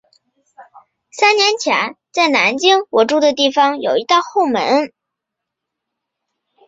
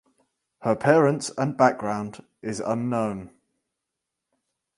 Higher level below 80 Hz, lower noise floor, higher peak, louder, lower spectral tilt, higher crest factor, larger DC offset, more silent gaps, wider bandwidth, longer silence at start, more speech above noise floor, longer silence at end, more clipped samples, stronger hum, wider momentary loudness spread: about the same, -66 dBFS vs -64 dBFS; second, -80 dBFS vs -84 dBFS; first, 0 dBFS vs -4 dBFS; first, -14 LUFS vs -24 LUFS; second, -2 dB/octave vs -6 dB/octave; second, 16 dB vs 22 dB; neither; neither; second, 8 kHz vs 11.5 kHz; about the same, 0.6 s vs 0.6 s; first, 66 dB vs 60 dB; first, 1.8 s vs 1.5 s; neither; neither; second, 6 LU vs 15 LU